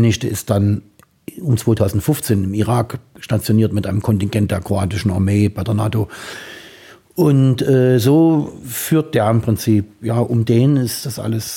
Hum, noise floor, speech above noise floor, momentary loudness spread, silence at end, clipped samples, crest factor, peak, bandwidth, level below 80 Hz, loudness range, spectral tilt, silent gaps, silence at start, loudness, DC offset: none; -43 dBFS; 27 dB; 12 LU; 0 s; under 0.1%; 16 dB; -2 dBFS; 17 kHz; -46 dBFS; 4 LU; -6.5 dB/octave; none; 0 s; -17 LUFS; under 0.1%